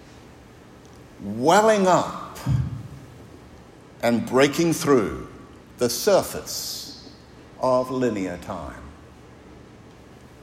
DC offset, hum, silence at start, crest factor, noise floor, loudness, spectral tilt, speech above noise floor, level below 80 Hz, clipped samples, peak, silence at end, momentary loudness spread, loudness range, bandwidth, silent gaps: under 0.1%; none; 0.1 s; 22 dB; -47 dBFS; -22 LUFS; -5 dB/octave; 26 dB; -48 dBFS; under 0.1%; -2 dBFS; 0 s; 21 LU; 6 LU; 16 kHz; none